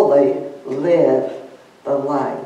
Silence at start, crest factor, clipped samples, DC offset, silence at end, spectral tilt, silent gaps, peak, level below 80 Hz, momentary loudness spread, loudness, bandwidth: 0 s; 16 dB; under 0.1%; under 0.1%; 0 s; -8 dB/octave; none; -2 dBFS; -74 dBFS; 14 LU; -18 LUFS; 8.6 kHz